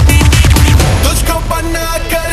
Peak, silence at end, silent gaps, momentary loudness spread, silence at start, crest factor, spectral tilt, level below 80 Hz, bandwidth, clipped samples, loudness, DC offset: 0 dBFS; 0 s; none; 8 LU; 0 s; 8 dB; -4.5 dB/octave; -12 dBFS; 14.5 kHz; 0.5%; -10 LUFS; under 0.1%